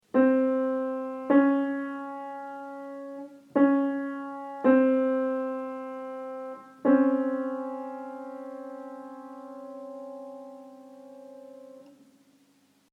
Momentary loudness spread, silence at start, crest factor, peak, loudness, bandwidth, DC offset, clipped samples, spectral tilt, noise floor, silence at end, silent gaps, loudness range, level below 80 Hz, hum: 23 LU; 0.15 s; 18 dB; -10 dBFS; -27 LUFS; 3.8 kHz; under 0.1%; under 0.1%; -7.5 dB/octave; -64 dBFS; 1.1 s; none; 17 LU; -86 dBFS; 50 Hz at -75 dBFS